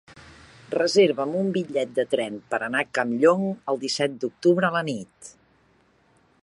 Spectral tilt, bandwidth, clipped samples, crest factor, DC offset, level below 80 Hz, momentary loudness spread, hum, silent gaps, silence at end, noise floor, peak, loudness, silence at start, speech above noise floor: -5 dB/octave; 11.5 kHz; under 0.1%; 18 dB; under 0.1%; -68 dBFS; 9 LU; none; none; 1.15 s; -62 dBFS; -6 dBFS; -24 LUFS; 0.1 s; 38 dB